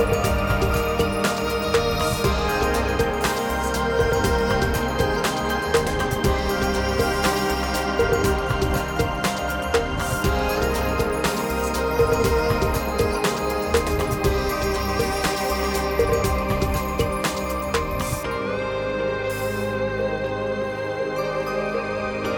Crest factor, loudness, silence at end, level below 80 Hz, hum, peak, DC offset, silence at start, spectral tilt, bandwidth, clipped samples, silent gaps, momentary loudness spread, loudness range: 16 dB; -23 LUFS; 0 s; -32 dBFS; none; -6 dBFS; under 0.1%; 0 s; -5 dB/octave; over 20 kHz; under 0.1%; none; 5 LU; 3 LU